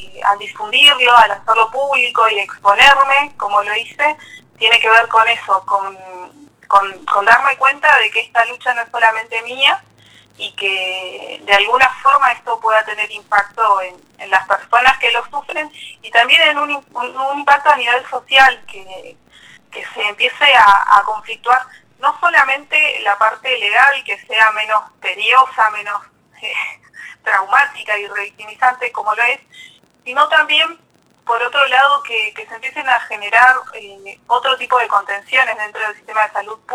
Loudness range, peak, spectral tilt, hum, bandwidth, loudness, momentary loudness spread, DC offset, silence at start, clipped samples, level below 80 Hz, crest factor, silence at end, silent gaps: 4 LU; 0 dBFS; 0 dB/octave; none; 16.5 kHz; -13 LUFS; 15 LU; under 0.1%; 0 s; under 0.1%; -56 dBFS; 16 dB; 0 s; none